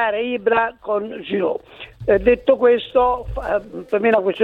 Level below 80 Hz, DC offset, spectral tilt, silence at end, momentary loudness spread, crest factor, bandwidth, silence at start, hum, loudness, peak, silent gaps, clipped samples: -40 dBFS; under 0.1%; -7.5 dB/octave; 0 s; 9 LU; 16 dB; 4.3 kHz; 0 s; none; -19 LUFS; -2 dBFS; none; under 0.1%